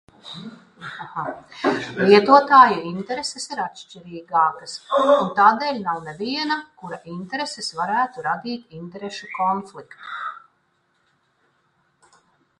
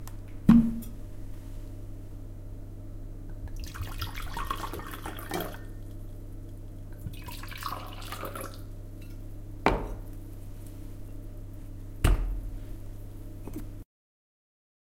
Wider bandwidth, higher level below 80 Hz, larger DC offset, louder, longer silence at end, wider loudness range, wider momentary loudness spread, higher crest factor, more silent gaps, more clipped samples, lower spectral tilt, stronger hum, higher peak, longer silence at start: second, 11 kHz vs 17 kHz; second, -68 dBFS vs -38 dBFS; neither; first, -20 LUFS vs -32 LUFS; first, 2.2 s vs 1 s; first, 13 LU vs 7 LU; first, 23 LU vs 16 LU; second, 22 dB vs 30 dB; neither; neither; second, -4.5 dB/octave vs -6.5 dB/octave; neither; first, 0 dBFS vs -4 dBFS; first, 0.25 s vs 0 s